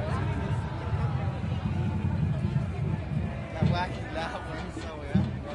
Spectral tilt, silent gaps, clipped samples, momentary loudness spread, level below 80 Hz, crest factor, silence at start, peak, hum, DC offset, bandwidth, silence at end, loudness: -8 dB/octave; none; under 0.1%; 6 LU; -42 dBFS; 18 dB; 0 s; -12 dBFS; none; under 0.1%; 10.5 kHz; 0 s; -31 LUFS